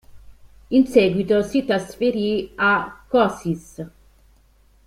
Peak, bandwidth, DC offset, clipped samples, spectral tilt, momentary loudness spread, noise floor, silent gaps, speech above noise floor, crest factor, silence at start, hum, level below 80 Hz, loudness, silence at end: -2 dBFS; 14.5 kHz; under 0.1%; under 0.1%; -6 dB/octave; 12 LU; -55 dBFS; none; 36 dB; 18 dB; 0.15 s; none; -50 dBFS; -20 LUFS; 1 s